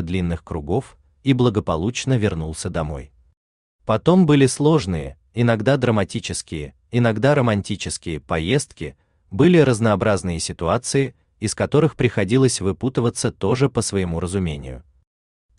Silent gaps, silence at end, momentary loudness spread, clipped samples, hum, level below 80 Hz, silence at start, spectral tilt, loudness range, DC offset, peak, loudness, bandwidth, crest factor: 3.37-3.79 s; 0.75 s; 13 LU; under 0.1%; none; -44 dBFS; 0 s; -6 dB/octave; 3 LU; under 0.1%; -4 dBFS; -20 LUFS; 12.5 kHz; 16 dB